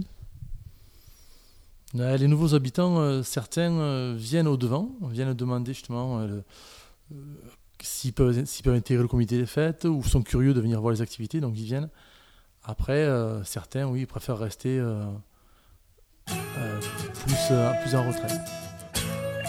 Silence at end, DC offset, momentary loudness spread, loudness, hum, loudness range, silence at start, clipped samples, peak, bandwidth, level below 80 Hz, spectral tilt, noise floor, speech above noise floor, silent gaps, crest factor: 0 s; under 0.1%; 16 LU; -27 LUFS; none; 7 LU; 0 s; under 0.1%; -8 dBFS; 16.5 kHz; -42 dBFS; -6 dB/octave; -59 dBFS; 33 dB; none; 20 dB